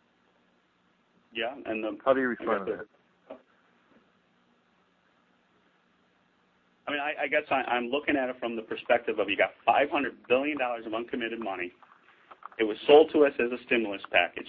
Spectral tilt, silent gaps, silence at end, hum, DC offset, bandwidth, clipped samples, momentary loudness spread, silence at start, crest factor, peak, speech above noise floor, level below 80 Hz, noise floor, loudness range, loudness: -7.5 dB/octave; none; 0 s; none; under 0.1%; 4.6 kHz; under 0.1%; 12 LU; 1.35 s; 22 dB; -6 dBFS; 41 dB; -68 dBFS; -68 dBFS; 9 LU; -28 LUFS